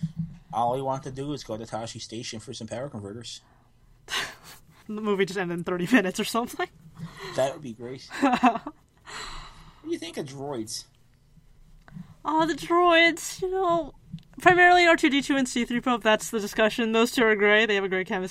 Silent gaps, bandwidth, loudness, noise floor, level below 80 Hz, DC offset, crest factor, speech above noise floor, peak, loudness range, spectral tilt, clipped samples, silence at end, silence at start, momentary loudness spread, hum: none; 16 kHz; -24 LUFS; -57 dBFS; -54 dBFS; under 0.1%; 22 dB; 33 dB; -4 dBFS; 14 LU; -4 dB/octave; under 0.1%; 0 s; 0 s; 19 LU; none